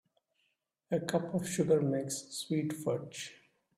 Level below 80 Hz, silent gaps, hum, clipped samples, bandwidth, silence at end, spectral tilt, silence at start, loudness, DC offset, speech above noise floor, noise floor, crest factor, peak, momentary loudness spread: -72 dBFS; none; none; under 0.1%; 15.5 kHz; 0.45 s; -5.5 dB/octave; 0.9 s; -34 LUFS; under 0.1%; 47 dB; -80 dBFS; 18 dB; -16 dBFS; 11 LU